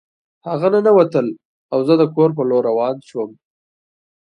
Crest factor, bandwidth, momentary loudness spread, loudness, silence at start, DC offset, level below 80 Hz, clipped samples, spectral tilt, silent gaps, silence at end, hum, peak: 18 dB; 9 kHz; 14 LU; -17 LUFS; 0.45 s; under 0.1%; -68 dBFS; under 0.1%; -8.5 dB/octave; 1.45-1.69 s; 1.05 s; none; 0 dBFS